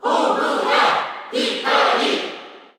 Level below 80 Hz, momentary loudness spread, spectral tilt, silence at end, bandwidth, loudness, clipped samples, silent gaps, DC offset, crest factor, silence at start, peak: -78 dBFS; 9 LU; -2 dB/octave; 0.2 s; 17.5 kHz; -18 LUFS; under 0.1%; none; under 0.1%; 16 dB; 0 s; -4 dBFS